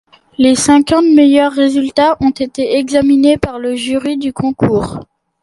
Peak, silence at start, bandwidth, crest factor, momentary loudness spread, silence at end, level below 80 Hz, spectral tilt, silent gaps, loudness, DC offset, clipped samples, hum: 0 dBFS; 0.4 s; 11.5 kHz; 12 dB; 10 LU; 0.4 s; -40 dBFS; -5 dB/octave; none; -12 LUFS; under 0.1%; under 0.1%; none